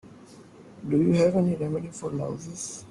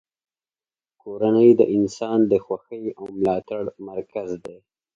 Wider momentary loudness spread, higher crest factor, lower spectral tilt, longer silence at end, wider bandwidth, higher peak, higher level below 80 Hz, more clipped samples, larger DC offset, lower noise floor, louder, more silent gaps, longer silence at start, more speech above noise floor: second, 14 LU vs 18 LU; about the same, 16 dB vs 20 dB; about the same, -7 dB/octave vs -7.5 dB/octave; second, 0 s vs 0.4 s; first, 11.5 kHz vs 7.6 kHz; second, -10 dBFS vs -4 dBFS; about the same, -60 dBFS vs -60 dBFS; neither; neither; second, -49 dBFS vs under -90 dBFS; second, -26 LUFS vs -21 LUFS; neither; second, 0.05 s vs 1.05 s; second, 23 dB vs over 69 dB